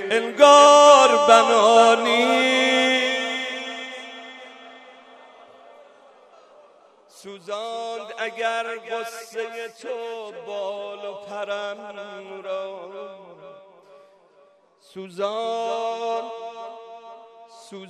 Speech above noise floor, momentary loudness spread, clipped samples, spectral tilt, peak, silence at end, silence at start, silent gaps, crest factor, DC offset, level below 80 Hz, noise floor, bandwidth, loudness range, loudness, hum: 36 dB; 24 LU; under 0.1%; -1.5 dB/octave; 0 dBFS; 0 s; 0 s; none; 22 dB; under 0.1%; -82 dBFS; -56 dBFS; 13 kHz; 22 LU; -18 LUFS; none